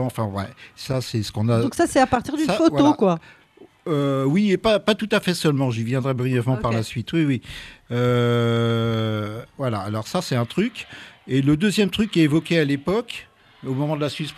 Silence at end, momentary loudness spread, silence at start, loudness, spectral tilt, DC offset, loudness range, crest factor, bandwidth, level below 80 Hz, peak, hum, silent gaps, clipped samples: 0.05 s; 11 LU; 0 s; -21 LUFS; -6 dB/octave; under 0.1%; 3 LU; 16 dB; 14 kHz; -50 dBFS; -6 dBFS; none; none; under 0.1%